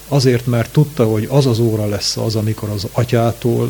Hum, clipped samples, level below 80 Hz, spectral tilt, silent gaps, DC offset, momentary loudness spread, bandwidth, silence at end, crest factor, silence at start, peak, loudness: none; under 0.1%; -42 dBFS; -6 dB/octave; none; under 0.1%; 5 LU; 19.5 kHz; 0 s; 16 dB; 0 s; 0 dBFS; -16 LUFS